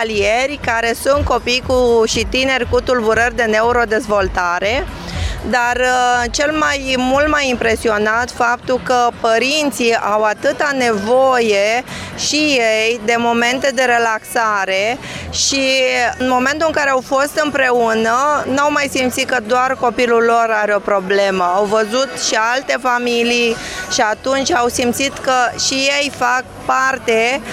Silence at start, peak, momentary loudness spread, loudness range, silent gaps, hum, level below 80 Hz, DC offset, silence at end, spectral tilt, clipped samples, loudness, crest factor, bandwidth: 0 s; -2 dBFS; 4 LU; 1 LU; none; none; -36 dBFS; under 0.1%; 0 s; -3 dB/octave; under 0.1%; -15 LUFS; 14 dB; 15.5 kHz